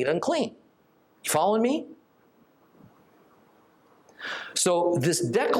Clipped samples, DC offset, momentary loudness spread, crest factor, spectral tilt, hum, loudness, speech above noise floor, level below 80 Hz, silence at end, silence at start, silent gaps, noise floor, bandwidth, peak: under 0.1%; under 0.1%; 12 LU; 18 dB; -4 dB/octave; none; -26 LUFS; 38 dB; -74 dBFS; 0 s; 0 s; none; -63 dBFS; 16.5 kHz; -10 dBFS